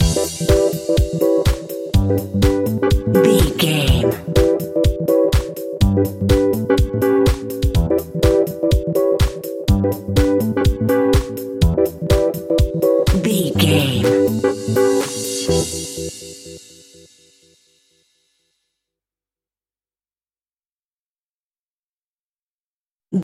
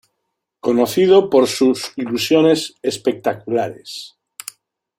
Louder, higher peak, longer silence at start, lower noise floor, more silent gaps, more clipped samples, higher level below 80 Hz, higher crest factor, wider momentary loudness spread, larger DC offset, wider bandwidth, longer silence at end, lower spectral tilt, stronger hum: about the same, -17 LUFS vs -17 LUFS; about the same, 0 dBFS vs -2 dBFS; second, 0 s vs 0.65 s; first, under -90 dBFS vs -76 dBFS; first, 20.72-21.51 s, 21.58-22.97 s vs none; neither; first, -26 dBFS vs -62 dBFS; about the same, 18 dB vs 16 dB; second, 6 LU vs 21 LU; neither; about the same, 16.5 kHz vs 16.5 kHz; second, 0 s vs 0.9 s; first, -6 dB/octave vs -4.5 dB/octave; neither